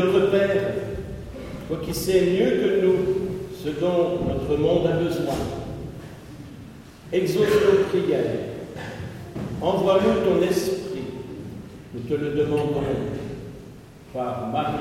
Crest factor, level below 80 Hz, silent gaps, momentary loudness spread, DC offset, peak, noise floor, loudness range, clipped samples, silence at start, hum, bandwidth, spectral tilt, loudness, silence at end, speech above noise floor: 18 dB; -44 dBFS; none; 18 LU; under 0.1%; -6 dBFS; -43 dBFS; 5 LU; under 0.1%; 0 s; none; 16 kHz; -6.5 dB/octave; -23 LUFS; 0 s; 22 dB